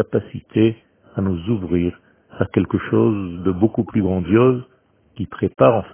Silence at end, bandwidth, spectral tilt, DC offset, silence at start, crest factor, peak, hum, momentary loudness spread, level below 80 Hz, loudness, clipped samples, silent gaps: 0.05 s; 3.5 kHz; -12.5 dB/octave; under 0.1%; 0 s; 18 dB; 0 dBFS; none; 11 LU; -42 dBFS; -19 LUFS; under 0.1%; none